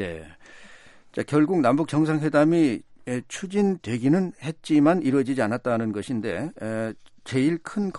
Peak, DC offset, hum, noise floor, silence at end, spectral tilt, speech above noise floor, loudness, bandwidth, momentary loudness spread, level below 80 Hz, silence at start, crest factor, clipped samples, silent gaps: -6 dBFS; under 0.1%; none; -48 dBFS; 0 s; -7 dB/octave; 25 dB; -24 LUFS; 11.5 kHz; 13 LU; -62 dBFS; 0 s; 16 dB; under 0.1%; none